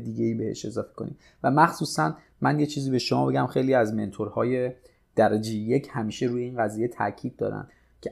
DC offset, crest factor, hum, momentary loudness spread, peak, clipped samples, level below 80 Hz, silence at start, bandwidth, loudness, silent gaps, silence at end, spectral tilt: under 0.1%; 20 dB; none; 10 LU; -6 dBFS; under 0.1%; -62 dBFS; 0 s; 14.5 kHz; -26 LUFS; none; 0 s; -6 dB/octave